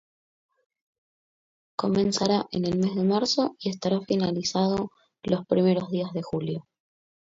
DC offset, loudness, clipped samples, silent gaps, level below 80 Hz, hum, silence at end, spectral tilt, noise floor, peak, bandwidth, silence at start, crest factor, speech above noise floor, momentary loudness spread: under 0.1%; -26 LUFS; under 0.1%; none; -60 dBFS; none; 0.7 s; -6 dB/octave; under -90 dBFS; -8 dBFS; 7.8 kHz; 1.8 s; 18 dB; over 65 dB; 8 LU